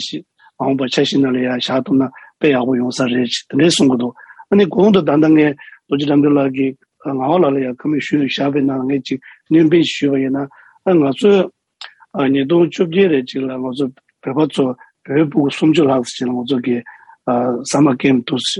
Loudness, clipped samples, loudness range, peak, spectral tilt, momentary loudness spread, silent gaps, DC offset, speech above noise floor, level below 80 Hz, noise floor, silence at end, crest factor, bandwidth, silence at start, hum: -16 LUFS; under 0.1%; 3 LU; -2 dBFS; -5.5 dB/octave; 11 LU; none; under 0.1%; 24 dB; -62 dBFS; -39 dBFS; 0 s; 14 dB; 11 kHz; 0 s; none